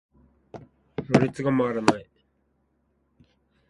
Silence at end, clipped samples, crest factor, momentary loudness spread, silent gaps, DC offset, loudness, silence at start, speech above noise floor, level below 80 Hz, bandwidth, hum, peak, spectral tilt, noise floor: 1.65 s; under 0.1%; 28 dB; 24 LU; none; under 0.1%; -24 LUFS; 0.55 s; 47 dB; -58 dBFS; 11.5 kHz; none; 0 dBFS; -6.5 dB/octave; -70 dBFS